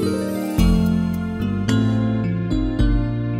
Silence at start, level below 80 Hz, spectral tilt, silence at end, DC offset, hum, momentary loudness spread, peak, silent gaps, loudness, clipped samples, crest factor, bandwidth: 0 s; -26 dBFS; -7.5 dB/octave; 0 s; under 0.1%; none; 6 LU; -4 dBFS; none; -20 LUFS; under 0.1%; 14 dB; 16 kHz